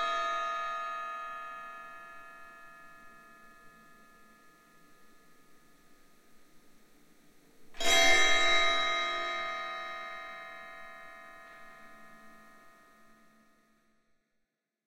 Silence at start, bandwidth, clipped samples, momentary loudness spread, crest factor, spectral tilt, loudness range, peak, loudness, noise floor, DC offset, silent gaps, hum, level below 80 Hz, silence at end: 0 s; 15.5 kHz; under 0.1%; 28 LU; 24 dB; 0 dB/octave; 23 LU; -10 dBFS; -29 LUFS; -82 dBFS; under 0.1%; none; none; -56 dBFS; 2.3 s